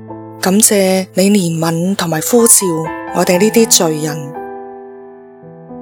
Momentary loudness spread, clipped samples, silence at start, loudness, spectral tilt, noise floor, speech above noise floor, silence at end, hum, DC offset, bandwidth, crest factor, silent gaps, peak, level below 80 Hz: 19 LU; 0.3%; 0 s; -11 LUFS; -3.5 dB/octave; -36 dBFS; 24 dB; 0 s; none; under 0.1%; over 20 kHz; 14 dB; none; 0 dBFS; -54 dBFS